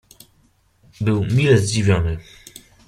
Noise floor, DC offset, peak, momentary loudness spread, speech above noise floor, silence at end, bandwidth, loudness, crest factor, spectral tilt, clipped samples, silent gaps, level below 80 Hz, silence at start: -59 dBFS; under 0.1%; -2 dBFS; 20 LU; 41 dB; 0.65 s; 14.5 kHz; -18 LUFS; 18 dB; -6 dB/octave; under 0.1%; none; -40 dBFS; 1 s